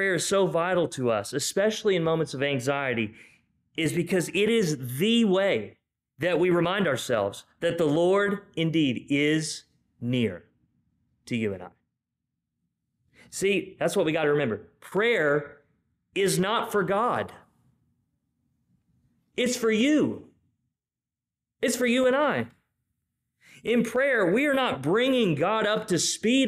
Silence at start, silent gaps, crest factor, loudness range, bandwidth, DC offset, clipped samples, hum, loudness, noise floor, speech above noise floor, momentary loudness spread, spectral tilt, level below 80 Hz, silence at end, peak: 0 s; none; 12 dB; 5 LU; 15.5 kHz; under 0.1%; under 0.1%; none; -25 LUFS; under -90 dBFS; over 65 dB; 10 LU; -4.5 dB/octave; -66 dBFS; 0 s; -14 dBFS